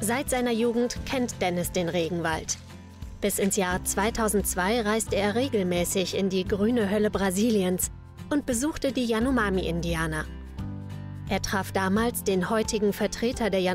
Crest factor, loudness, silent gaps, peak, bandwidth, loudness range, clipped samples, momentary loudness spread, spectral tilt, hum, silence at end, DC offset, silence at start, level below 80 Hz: 12 dB; -26 LUFS; none; -14 dBFS; 16 kHz; 3 LU; under 0.1%; 9 LU; -4.5 dB/octave; none; 0 s; under 0.1%; 0 s; -42 dBFS